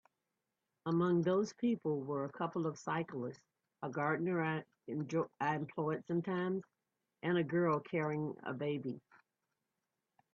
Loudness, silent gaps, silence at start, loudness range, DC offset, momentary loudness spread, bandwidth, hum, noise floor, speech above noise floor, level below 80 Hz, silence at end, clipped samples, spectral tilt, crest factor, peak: -38 LUFS; none; 0.85 s; 2 LU; under 0.1%; 10 LU; 7.6 kHz; none; -89 dBFS; 52 dB; -80 dBFS; 1.35 s; under 0.1%; -7.5 dB/octave; 18 dB; -20 dBFS